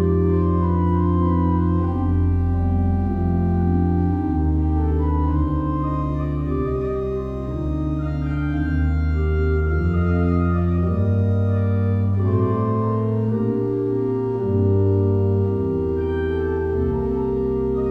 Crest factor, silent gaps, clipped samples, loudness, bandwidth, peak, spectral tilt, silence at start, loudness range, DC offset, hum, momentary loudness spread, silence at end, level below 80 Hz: 12 dB; none; under 0.1%; -21 LUFS; 4.3 kHz; -8 dBFS; -11.5 dB/octave; 0 s; 3 LU; under 0.1%; none; 4 LU; 0 s; -28 dBFS